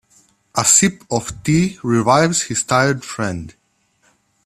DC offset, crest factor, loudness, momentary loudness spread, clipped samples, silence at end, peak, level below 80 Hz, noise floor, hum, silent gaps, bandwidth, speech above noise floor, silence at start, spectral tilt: under 0.1%; 18 dB; -16 LUFS; 12 LU; under 0.1%; 0.95 s; 0 dBFS; -48 dBFS; -61 dBFS; none; none; 14 kHz; 44 dB; 0.55 s; -3.5 dB/octave